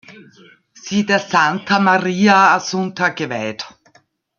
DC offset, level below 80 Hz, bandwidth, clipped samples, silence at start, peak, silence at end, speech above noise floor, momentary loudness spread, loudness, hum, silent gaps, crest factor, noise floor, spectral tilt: under 0.1%; -62 dBFS; 7.2 kHz; under 0.1%; 0.1 s; 0 dBFS; 0.7 s; 39 dB; 14 LU; -16 LUFS; none; none; 18 dB; -56 dBFS; -4.5 dB/octave